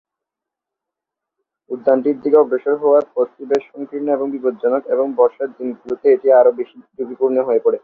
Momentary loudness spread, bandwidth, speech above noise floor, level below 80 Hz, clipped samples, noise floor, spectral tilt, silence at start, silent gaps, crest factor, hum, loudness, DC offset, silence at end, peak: 15 LU; 6.8 kHz; 68 dB; -66 dBFS; under 0.1%; -84 dBFS; -7.5 dB/octave; 1.7 s; none; 16 dB; none; -17 LUFS; under 0.1%; 0.05 s; -2 dBFS